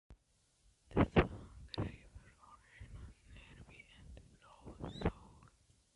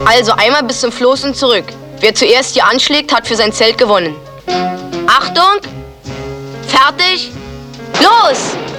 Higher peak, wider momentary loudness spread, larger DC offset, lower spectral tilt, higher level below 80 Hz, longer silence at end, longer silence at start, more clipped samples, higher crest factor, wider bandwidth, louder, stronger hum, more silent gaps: second, -14 dBFS vs 0 dBFS; first, 27 LU vs 17 LU; neither; first, -7.5 dB/octave vs -2.5 dB/octave; second, -52 dBFS vs -42 dBFS; first, 0.7 s vs 0 s; about the same, 0.1 s vs 0 s; second, under 0.1% vs 0.3%; first, 28 dB vs 12 dB; second, 11.5 kHz vs 18 kHz; second, -38 LUFS vs -10 LUFS; neither; neither